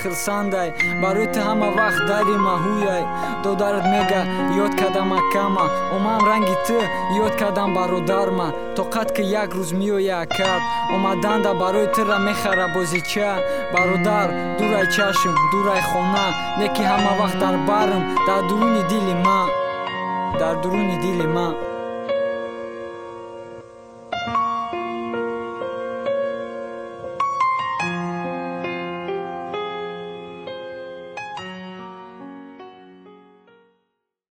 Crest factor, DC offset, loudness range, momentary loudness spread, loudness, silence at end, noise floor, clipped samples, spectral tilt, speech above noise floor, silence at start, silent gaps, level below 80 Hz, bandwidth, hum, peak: 18 dB; under 0.1%; 10 LU; 15 LU; -21 LUFS; 0.1 s; -74 dBFS; under 0.1%; -5 dB/octave; 54 dB; 0 s; none; -52 dBFS; 17 kHz; none; -4 dBFS